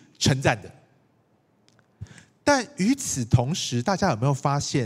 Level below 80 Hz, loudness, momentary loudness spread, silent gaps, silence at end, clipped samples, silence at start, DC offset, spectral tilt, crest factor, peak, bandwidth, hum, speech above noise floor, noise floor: -52 dBFS; -24 LUFS; 8 LU; none; 0 s; under 0.1%; 0.2 s; under 0.1%; -5 dB/octave; 22 dB; -4 dBFS; 15.5 kHz; none; 41 dB; -64 dBFS